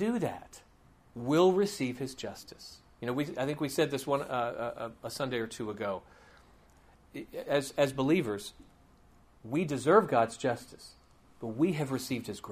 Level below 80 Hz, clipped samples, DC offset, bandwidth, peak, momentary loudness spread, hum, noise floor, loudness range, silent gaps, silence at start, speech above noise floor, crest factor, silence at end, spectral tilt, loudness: -64 dBFS; under 0.1%; under 0.1%; 15.5 kHz; -10 dBFS; 21 LU; none; -61 dBFS; 6 LU; none; 0 s; 30 dB; 24 dB; 0 s; -5.5 dB/octave; -32 LUFS